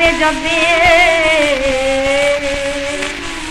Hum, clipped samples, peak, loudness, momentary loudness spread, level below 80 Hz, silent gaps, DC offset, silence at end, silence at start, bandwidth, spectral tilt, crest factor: none; under 0.1%; -2 dBFS; -13 LUFS; 10 LU; -30 dBFS; none; under 0.1%; 0 s; 0 s; 15 kHz; -2.5 dB/octave; 12 dB